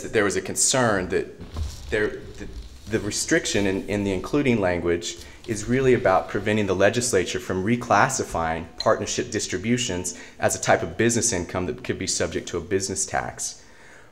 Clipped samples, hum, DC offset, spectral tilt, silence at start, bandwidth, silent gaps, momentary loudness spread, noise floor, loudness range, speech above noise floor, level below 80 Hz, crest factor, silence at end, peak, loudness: under 0.1%; none; 0.3%; -3.5 dB/octave; 0 s; 16 kHz; none; 12 LU; -49 dBFS; 3 LU; 25 dB; -44 dBFS; 22 dB; 0.1 s; -2 dBFS; -23 LUFS